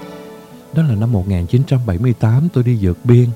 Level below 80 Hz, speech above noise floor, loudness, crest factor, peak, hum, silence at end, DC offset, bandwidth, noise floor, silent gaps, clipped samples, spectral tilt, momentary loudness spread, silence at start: -38 dBFS; 23 dB; -15 LUFS; 14 dB; 0 dBFS; none; 0 s; under 0.1%; 7.8 kHz; -36 dBFS; none; under 0.1%; -9.5 dB/octave; 11 LU; 0 s